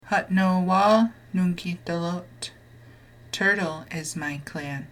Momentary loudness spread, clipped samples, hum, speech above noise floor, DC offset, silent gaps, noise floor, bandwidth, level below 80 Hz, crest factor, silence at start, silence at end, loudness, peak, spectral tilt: 14 LU; under 0.1%; none; 25 dB; under 0.1%; none; -49 dBFS; 15 kHz; -58 dBFS; 18 dB; 0.05 s; 0.05 s; -25 LUFS; -8 dBFS; -5.5 dB/octave